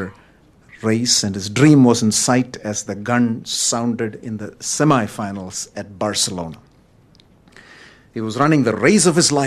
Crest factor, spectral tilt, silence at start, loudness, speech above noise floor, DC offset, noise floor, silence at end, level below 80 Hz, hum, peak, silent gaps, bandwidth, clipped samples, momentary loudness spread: 18 dB; -4 dB/octave; 0 s; -17 LUFS; 34 dB; under 0.1%; -51 dBFS; 0 s; -56 dBFS; none; 0 dBFS; none; 14.5 kHz; under 0.1%; 15 LU